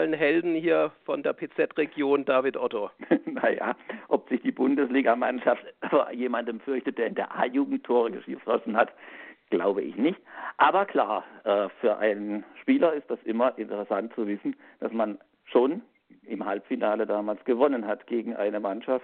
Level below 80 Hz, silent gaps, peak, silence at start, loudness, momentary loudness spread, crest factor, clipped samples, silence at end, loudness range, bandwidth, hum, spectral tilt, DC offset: -78 dBFS; none; -6 dBFS; 0 s; -27 LUFS; 9 LU; 20 dB; under 0.1%; 0 s; 3 LU; 4.4 kHz; none; -3.5 dB/octave; under 0.1%